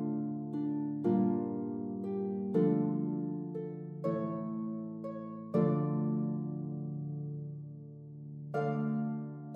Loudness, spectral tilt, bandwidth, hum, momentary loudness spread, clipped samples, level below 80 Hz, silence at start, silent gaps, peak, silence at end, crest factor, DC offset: -35 LUFS; -11.5 dB/octave; 4.5 kHz; none; 12 LU; under 0.1%; -82 dBFS; 0 s; none; -18 dBFS; 0 s; 18 dB; under 0.1%